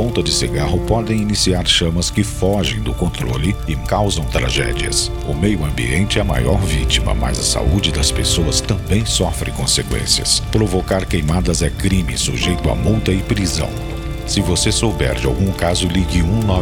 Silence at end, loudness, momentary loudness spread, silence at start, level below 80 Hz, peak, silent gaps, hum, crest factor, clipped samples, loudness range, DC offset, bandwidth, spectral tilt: 0 s; -17 LUFS; 5 LU; 0 s; -24 dBFS; 0 dBFS; none; none; 16 dB; under 0.1%; 2 LU; under 0.1%; 17 kHz; -4 dB/octave